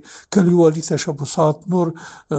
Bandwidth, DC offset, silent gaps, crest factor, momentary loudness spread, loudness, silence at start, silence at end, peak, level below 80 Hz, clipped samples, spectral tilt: 9 kHz; under 0.1%; none; 16 dB; 10 LU; -18 LUFS; 0.1 s; 0 s; -2 dBFS; -58 dBFS; under 0.1%; -6.5 dB/octave